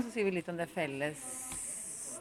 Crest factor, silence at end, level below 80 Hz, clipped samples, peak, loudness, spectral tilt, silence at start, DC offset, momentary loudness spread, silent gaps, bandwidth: 16 dB; 0 s; -68 dBFS; under 0.1%; -20 dBFS; -37 LUFS; -3.5 dB/octave; 0 s; under 0.1%; 6 LU; none; 17 kHz